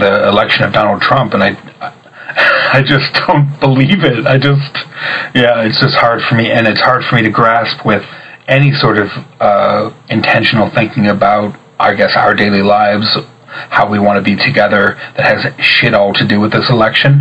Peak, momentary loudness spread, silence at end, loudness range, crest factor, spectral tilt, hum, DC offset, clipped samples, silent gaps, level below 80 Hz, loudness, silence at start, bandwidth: 0 dBFS; 7 LU; 0 s; 1 LU; 10 dB; -7.5 dB/octave; none; under 0.1%; under 0.1%; none; -46 dBFS; -10 LUFS; 0 s; 8 kHz